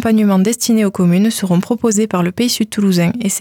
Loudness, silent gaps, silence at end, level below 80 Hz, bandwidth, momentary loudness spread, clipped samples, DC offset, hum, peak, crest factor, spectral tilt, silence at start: -14 LUFS; none; 0 s; -54 dBFS; 18.5 kHz; 3 LU; under 0.1%; under 0.1%; none; -4 dBFS; 10 dB; -5 dB/octave; 0 s